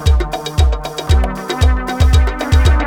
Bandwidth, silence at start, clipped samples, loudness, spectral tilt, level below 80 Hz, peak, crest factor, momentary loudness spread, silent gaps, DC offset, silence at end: 15 kHz; 0 s; under 0.1%; -15 LUFS; -5.5 dB/octave; -14 dBFS; 0 dBFS; 12 dB; 6 LU; none; under 0.1%; 0 s